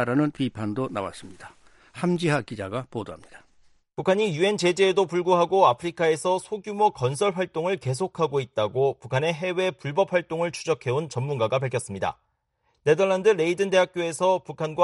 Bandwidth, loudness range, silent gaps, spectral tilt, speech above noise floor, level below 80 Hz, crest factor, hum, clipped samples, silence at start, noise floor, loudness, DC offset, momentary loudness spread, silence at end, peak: 11.5 kHz; 6 LU; none; -5.5 dB/octave; 48 dB; -64 dBFS; 20 dB; none; under 0.1%; 0 s; -72 dBFS; -25 LUFS; under 0.1%; 10 LU; 0 s; -6 dBFS